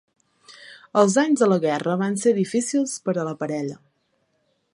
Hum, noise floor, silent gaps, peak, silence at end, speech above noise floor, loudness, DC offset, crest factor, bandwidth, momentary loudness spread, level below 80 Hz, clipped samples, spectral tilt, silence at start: none; -69 dBFS; none; -2 dBFS; 1 s; 48 dB; -22 LUFS; under 0.1%; 20 dB; 11.5 kHz; 11 LU; -74 dBFS; under 0.1%; -5.5 dB/octave; 0.5 s